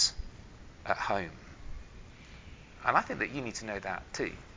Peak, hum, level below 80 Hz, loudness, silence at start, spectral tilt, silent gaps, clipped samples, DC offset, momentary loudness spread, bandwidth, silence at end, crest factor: -10 dBFS; none; -50 dBFS; -33 LUFS; 0 s; -2.5 dB/octave; none; under 0.1%; under 0.1%; 23 LU; 7.8 kHz; 0 s; 26 dB